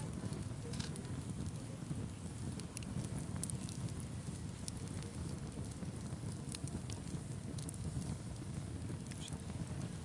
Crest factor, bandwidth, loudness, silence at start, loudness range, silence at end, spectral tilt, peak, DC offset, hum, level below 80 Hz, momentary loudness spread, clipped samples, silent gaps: 24 dB; 11.5 kHz; -45 LUFS; 0 s; 1 LU; 0 s; -5.5 dB/octave; -20 dBFS; under 0.1%; none; -56 dBFS; 3 LU; under 0.1%; none